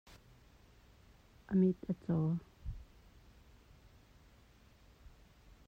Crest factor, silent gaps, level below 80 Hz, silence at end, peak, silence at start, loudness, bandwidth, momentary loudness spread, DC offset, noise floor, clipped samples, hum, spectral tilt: 20 dB; none; -58 dBFS; 0.6 s; -22 dBFS; 1.5 s; -36 LUFS; 6.6 kHz; 20 LU; under 0.1%; -64 dBFS; under 0.1%; none; -10 dB/octave